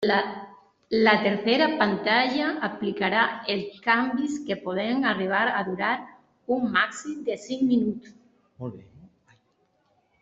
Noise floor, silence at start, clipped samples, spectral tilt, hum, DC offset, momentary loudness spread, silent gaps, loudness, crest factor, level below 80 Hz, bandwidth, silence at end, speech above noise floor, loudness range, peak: -69 dBFS; 0 s; under 0.1%; -5 dB/octave; none; under 0.1%; 11 LU; none; -25 LUFS; 22 dB; -68 dBFS; 8 kHz; 1.15 s; 44 dB; 5 LU; -4 dBFS